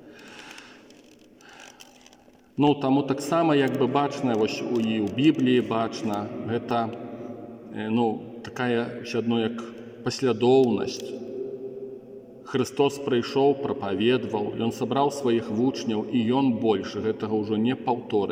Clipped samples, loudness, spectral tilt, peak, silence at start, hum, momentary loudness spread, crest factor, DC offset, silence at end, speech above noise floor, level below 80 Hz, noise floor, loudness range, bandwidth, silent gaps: under 0.1%; -25 LUFS; -6 dB/octave; -8 dBFS; 0.05 s; none; 17 LU; 18 dB; under 0.1%; 0 s; 30 dB; -68 dBFS; -55 dBFS; 5 LU; 16 kHz; none